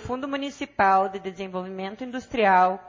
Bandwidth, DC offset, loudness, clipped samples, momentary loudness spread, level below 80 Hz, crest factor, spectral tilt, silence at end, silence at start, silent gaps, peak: 7.6 kHz; under 0.1%; -24 LUFS; under 0.1%; 14 LU; -56 dBFS; 18 dB; -5.5 dB/octave; 0 s; 0 s; none; -8 dBFS